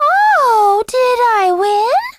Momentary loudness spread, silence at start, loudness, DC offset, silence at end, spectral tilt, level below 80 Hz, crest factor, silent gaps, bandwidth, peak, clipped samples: 3 LU; 0 s; -12 LUFS; under 0.1%; 0.05 s; -2 dB/octave; -56 dBFS; 8 dB; none; 15.5 kHz; -4 dBFS; under 0.1%